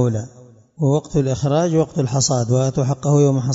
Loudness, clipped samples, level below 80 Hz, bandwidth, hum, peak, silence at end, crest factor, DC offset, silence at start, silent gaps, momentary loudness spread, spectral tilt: -18 LUFS; under 0.1%; -48 dBFS; 7.8 kHz; none; -4 dBFS; 0 s; 14 dB; under 0.1%; 0 s; none; 6 LU; -6.5 dB/octave